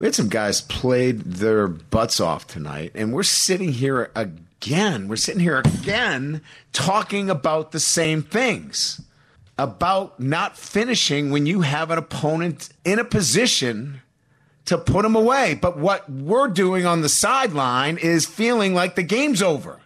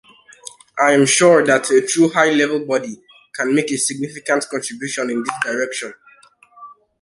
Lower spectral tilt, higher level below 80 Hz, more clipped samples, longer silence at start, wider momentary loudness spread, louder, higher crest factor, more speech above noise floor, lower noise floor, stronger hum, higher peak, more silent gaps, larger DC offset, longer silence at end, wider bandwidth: about the same, -4 dB/octave vs -3.5 dB/octave; first, -48 dBFS vs -66 dBFS; neither; second, 0 s vs 0.45 s; second, 10 LU vs 20 LU; second, -20 LUFS vs -17 LUFS; about the same, 14 dB vs 18 dB; first, 39 dB vs 33 dB; first, -60 dBFS vs -50 dBFS; neither; second, -6 dBFS vs -2 dBFS; neither; neither; second, 0.1 s vs 0.3 s; first, 14.5 kHz vs 11.5 kHz